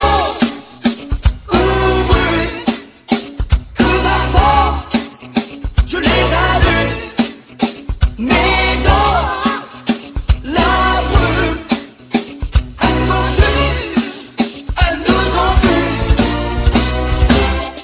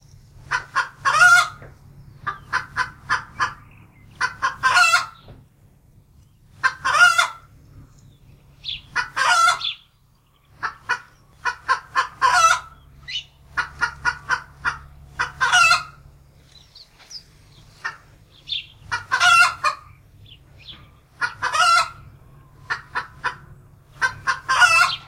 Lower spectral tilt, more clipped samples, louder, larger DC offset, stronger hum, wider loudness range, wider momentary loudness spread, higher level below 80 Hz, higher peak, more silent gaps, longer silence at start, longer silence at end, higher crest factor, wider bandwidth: first, -10 dB/octave vs 0 dB/octave; neither; first, -15 LUFS vs -19 LUFS; neither; neither; about the same, 2 LU vs 4 LU; second, 8 LU vs 19 LU; first, -20 dBFS vs -52 dBFS; about the same, 0 dBFS vs -2 dBFS; neither; second, 0 s vs 0.5 s; about the same, 0 s vs 0.05 s; second, 14 dB vs 22 dB; second, 4 kHz vs 16 kHz